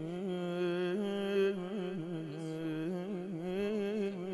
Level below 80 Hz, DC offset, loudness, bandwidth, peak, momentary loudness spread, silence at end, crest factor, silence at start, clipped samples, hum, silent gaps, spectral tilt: -72 dBFS; under 0.1%; -36 LUFS; 12 kHz; -22 dBFS; 7 LU; 0 s; 14 dB; 0 s; under 0.1%; none; none; -7.5 dB/octave